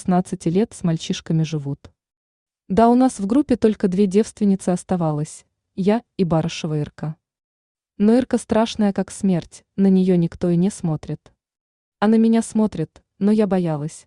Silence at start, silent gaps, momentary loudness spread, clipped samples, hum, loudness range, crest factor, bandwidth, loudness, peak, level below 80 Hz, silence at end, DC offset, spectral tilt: 0 s; 2.16-2.46 s, 7.44-7.75 s, 11.61-11.92 s; 12 LU; under 0.1%; none; 3 LU; 16 dB; 11 kHz; -20 LUFS; -4 dBFS; -52 dBFS; 0.05 s; under 0.1%; -7 dB/octave